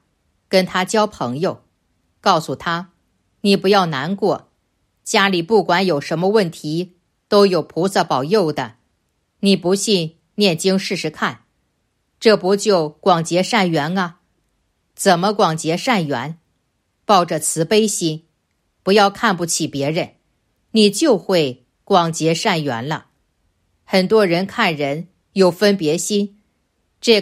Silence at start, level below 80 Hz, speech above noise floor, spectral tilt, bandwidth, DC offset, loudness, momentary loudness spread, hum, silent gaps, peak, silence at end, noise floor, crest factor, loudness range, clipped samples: 0.5 s; -62 dBFS; 51 dB; -4.5 dB/octave; 15.5 kHz; under 0.1%; -17 LUFS; 10 LU; none; none; 0 dBFS; 0 s; -68 dBFS; 18 dB; 2 LU; under 0.1%